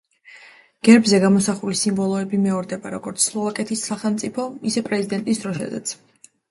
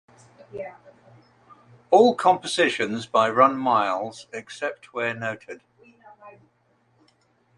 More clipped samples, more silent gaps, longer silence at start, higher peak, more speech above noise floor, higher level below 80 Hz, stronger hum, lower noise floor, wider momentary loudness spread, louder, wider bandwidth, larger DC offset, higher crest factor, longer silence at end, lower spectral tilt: neither; neither; second, 0.3 s vs 0.55 s; about the same, 0 dBFS vs -2 dBFS; second, 28 dB vs 43 dB; first, -62 dBFS vs -72 dBFS; neither; second, -48 dBFS vs -65 dBFS; second, 14 LU vs 20 LU; about the same, -20 LUFS vs -22 LUFS; about the same, 11.5 kHz vs 11.5 kHz; neither; about the same, 20 dB vs 22 dB; second, 0.55 s vs 1.25 s; about the same, -4.5 dB/octave vs -4 dB/octave